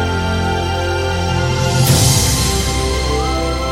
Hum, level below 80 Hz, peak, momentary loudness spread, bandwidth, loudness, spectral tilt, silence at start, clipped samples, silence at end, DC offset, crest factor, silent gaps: none; -24 dBFS; 0 dBFS; 6 LU; 16.5 kHz; -15 LUFS; -4 dB/octave; 0 s; under 0.1%; 0 s; under 0.1%; 14 dB; none